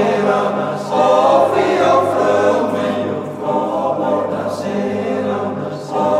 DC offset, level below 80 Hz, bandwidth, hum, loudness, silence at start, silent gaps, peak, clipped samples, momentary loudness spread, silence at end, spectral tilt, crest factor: under 0.1%; -58 dBFS; 13.5 kHz; none; -16 LUFS; 0 s; none; -2 dBFS; under 0.1%; 9 LU; 0 s; -6 dB/octave; 14 dB